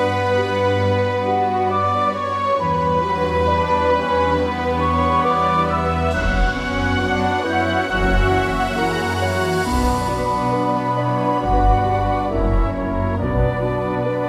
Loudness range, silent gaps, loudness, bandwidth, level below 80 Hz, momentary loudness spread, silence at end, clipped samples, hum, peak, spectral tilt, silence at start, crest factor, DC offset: 1 LU; none; -19 LUFS; 14.5 kHz; -28 dBFS; 3 LU; 0 s; under 0.1%; none; -2 dBFS; -6.5 dB/octave; 0 s; 16 dB; under 0.1%